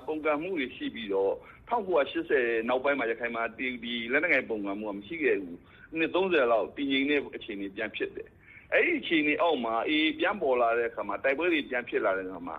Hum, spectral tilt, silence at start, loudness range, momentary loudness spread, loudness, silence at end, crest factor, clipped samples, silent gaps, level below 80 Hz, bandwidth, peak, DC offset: none; -7 dB/octave; 0 s; 2 LU; 11 LU; -28 LUFS; 0 s; 18 dB; under 0.1%; none; -62 dBFS; 5 kHz; -12 dBFS; under 0.1%